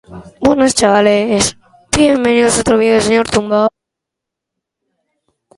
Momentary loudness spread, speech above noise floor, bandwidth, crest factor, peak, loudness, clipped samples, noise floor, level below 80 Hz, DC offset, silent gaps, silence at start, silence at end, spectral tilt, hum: 6 LU; 69 dB; 11.5 kHz; 14 dB; 0 dBFS; -12 LUFS; under 0.1%; -81 dBFS; -40 dBFS; under 0.1%; none; 0.1 s; 1.9 s; -3.5 dB/octave; none